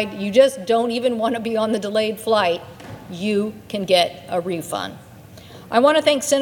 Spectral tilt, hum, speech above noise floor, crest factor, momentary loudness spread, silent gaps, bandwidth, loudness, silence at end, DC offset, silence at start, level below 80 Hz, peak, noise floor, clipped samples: -4 dB/octave; none; 22 dB; 18 dB; 12 LU; none; 19 kHz; -20 LUFS; 0 s; under 0.1%; 0 s; -60 dBFS; -2 dBFS; -41 dBFS; under 0.1%